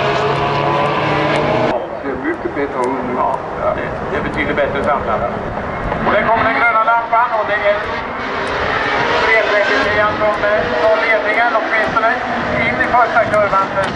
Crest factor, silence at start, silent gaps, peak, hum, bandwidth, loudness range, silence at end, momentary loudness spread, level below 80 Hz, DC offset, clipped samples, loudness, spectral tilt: 14 dB; 0 s; none; 0 dBFS; none; 10.5 kHz; 5 LU; 0 s; 8 LU; -38 dBFS; under 0.1%; under 0.1%; -15 LUFS; -5.5 dB/octave